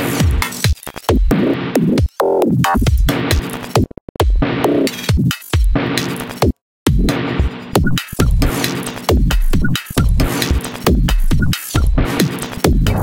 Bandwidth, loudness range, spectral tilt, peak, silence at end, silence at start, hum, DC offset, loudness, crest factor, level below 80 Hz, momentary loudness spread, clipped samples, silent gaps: 17 kHz; 2 LU; -5.5 dB/octave; 0 dBFS; 0 s; 0 s; none; under 0.1%; -17 LUFS; 14 dB; -18 dBFS; 4 LU; under 0.1%; 4.01-4.15 s, 6.61-6.86 s